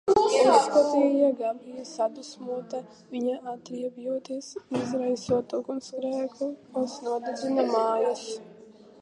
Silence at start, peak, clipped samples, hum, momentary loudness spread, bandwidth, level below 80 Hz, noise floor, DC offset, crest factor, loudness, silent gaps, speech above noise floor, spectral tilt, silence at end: 0.05 s; -6 dBFS; under 0.1%; none; 17 LU; 11.5 kHz; -66 dBFS; -51 dBFS; under 0.1%; 20 dB; -27 LUFS; none; 23 dB; -4.5 dB/octave; 0.5 s